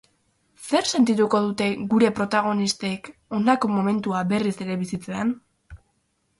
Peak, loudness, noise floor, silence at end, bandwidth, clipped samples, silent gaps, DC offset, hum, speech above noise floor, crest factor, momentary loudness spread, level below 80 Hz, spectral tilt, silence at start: -6 dBFS; -23 LUFS; -70 dBFS; 0.65 s; 11.5 kHz; under 0.1%; none; under 0.1%; none; 48 dB; 18 dB; 10 LU; -58 dBFS; -5 dB/octave; 0.6 s